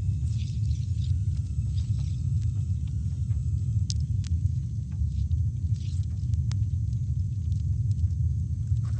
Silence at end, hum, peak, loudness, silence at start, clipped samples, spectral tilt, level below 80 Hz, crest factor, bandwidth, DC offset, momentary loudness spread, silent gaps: 0 s; none; -8 dBFS; -29 LUFS; 0 s; under 0.1%; -7 dB/octave; -34 dBFS; 18 dB; 8.8 kHz; under 0.1%; 2 LU; none